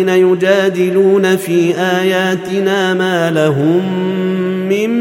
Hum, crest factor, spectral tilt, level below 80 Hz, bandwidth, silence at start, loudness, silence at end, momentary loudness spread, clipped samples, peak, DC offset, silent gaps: none; 12 dB; -6 dB/octave; -62 dBFS; 16.5 kHz; 0 s; -13 LUFS; 0 s; 5 LU; under 0.1%; 0 dBFS; under 0.1%; none